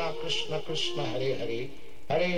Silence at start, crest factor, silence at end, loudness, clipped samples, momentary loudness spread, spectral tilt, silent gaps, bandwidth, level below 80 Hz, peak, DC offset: 0 s; 16 dB; 0 s; -31 LUFS; under 0.1%; 7 LU; -4.5 dB/octave; none; 16 kHz; -58 dBFS; -16 dBFS; 2%